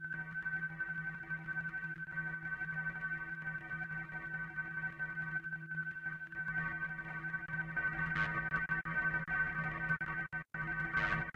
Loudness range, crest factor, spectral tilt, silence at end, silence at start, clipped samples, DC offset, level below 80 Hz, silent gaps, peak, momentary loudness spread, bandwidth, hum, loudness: 4 LU; 18 dB; -7 dB/octave; 0.05 s; 0 s; under 0.1%; under 0.1%; -60 dBFS; none; -22 dBFS; 7 LU; 7.4 kHz; none; -39 LUFS